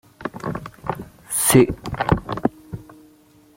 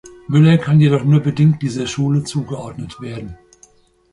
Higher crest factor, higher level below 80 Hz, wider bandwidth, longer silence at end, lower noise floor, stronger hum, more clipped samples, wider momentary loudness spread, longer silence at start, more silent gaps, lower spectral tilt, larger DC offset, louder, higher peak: first, 22 dB vs 14 dB; first, -42 dBFS vs -48 dBFS; first, 16.5 kHz vs 11 kHz; about the same, 0.75 s vs 0.75 s; about the same, -52 dBFS vs -51 dBFS; neither; neither; first, 21 LU vs 17 LU; first, 0.2 s vs 0.05 s; neither; second, -5 dB/octave vs -7.5 dB/octave; neither; second, -21 LUFS vs -15 LUFS; about the same, -2 dBFS vs -2 dBFS